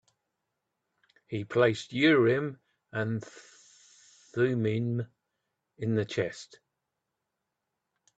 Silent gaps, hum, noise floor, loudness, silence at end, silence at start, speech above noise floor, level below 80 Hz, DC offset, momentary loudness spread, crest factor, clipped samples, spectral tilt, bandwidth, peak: none; none; -85 dBFS; -29 LUFS; 1.7 s; 1.3 s; 57 dB; -70 dBFS; under 0.1%; 15 LU; 22 dB; under 0.1%; -6.5 dB/octave; 8.2 kHz; -10 dBFS